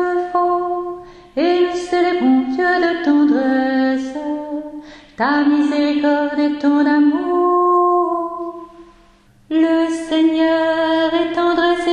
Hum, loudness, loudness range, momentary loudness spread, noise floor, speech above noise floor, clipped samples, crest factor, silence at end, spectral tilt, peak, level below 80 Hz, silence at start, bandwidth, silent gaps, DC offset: none; -16 LUFS; 2 LU; 11 LU; -50 dBFS; 35 dB; under 0.1%; 12 dB; 0 s; -4.5 dB/octave; -4 dBFS; -52 dBFS; 0 s; 9.8 kHz; none; under 0.1%